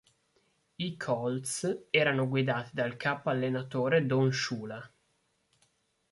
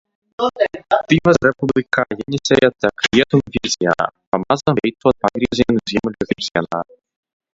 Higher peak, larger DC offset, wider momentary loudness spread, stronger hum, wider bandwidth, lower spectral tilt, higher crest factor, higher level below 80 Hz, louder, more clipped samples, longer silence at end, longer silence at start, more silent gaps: second, -10 dBFS vs 0 dBFS; neither; first, 11 LU vs 8 LU; neither; first, 12 kHz vs 7.8 kHz; about the same, -5 dB/octave vs -5 dB/octave; about the same, 22 dB vs 18 dB; second, -72 dBFS vs -46 dBFS; second, -30 LUFS vs -17 LUFS; neither; first, 1.25 s vs 0.7 s; first, 0.8 s vs 0.4 s; second, none vs 4.27-4.32 s